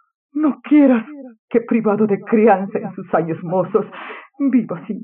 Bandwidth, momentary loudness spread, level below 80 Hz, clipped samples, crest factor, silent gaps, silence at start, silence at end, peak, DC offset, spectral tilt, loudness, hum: 3.7 kHz; 16 LU; -64 dBFS; under 0.1%; 16 dB; 1.39-1.48 s; 0.35 s; 0 s; -2 dBFS; under 0.1%; -7.5 dB/octave; -17 LUFS; none